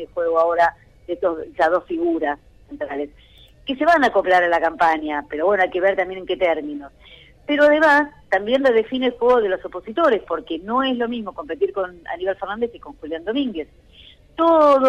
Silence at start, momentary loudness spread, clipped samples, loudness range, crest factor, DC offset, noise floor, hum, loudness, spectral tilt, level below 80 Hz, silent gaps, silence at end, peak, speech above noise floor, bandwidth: 0 s; 14 LU; under 0.1%; 6 LU; 14 dB; under 0.1%; -48 dBFS; none; -20 LUFS; -5 dB/octave; -52 dBFS; none; 0 s; -6 dBFS; 28 dB; 10.5 kHz